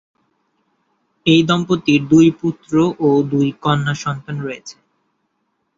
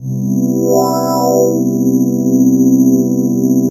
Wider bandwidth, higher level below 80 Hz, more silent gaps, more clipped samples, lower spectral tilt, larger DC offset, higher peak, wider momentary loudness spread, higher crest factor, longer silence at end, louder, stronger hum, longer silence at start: second, 7.6 kHz vs 14 kHz; about the same, -54 dBFS vs -54 dBFS; neither; neither; about the same, -6.5 dB/octave vs -7.5 dB/octave; neither; about the same, -2 dBFS vs 0 dBFS; first, 14 LU vs 4 LU; about the same, 16 dB vs 12 dB; first, 1.05 s vs 0 s; second, -16 LUFS vs -12 LUFS; neither; first, 1.25 s vs 0 s